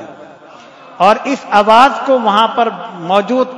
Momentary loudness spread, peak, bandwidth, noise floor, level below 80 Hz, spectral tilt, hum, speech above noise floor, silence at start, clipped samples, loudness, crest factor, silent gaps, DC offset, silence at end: 8 LU; 0 dBFS; 12 kHz; -37 dBFS; -56 dBFS; -4.5 dB/octave; none; 26 dB; 0 s; 1%; -11 LUFS; 12 dB; none; under 0.1%; 0 s